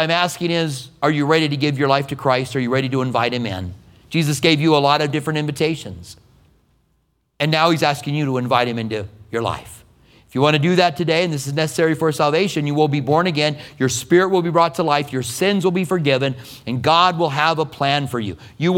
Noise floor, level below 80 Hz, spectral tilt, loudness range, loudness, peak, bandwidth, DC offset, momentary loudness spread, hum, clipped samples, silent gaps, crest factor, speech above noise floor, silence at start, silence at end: -65 dBFS; -54 dBFS; -5 dB/octave; 3 LU; -18 LUFS; 0 dBFS; 17 kHz; under 0.1%; 10 LU; none; under 0.1%; none; 18 dB; 47 dB; 0 s; 0 s